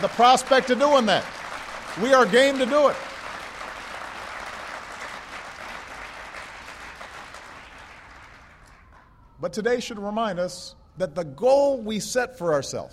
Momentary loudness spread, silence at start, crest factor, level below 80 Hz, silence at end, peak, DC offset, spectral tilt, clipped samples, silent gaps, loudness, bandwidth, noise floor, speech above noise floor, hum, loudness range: 21 LU; 0 s; 20 dB; -56 dBFS; 0.05 s; -4 dBFS; under 0.1%; -3.5 dB/octave; under 0.1%; none; -23 LUFS; 14.5 kHz; -52 dBFS; 30 dB; none; 18 LU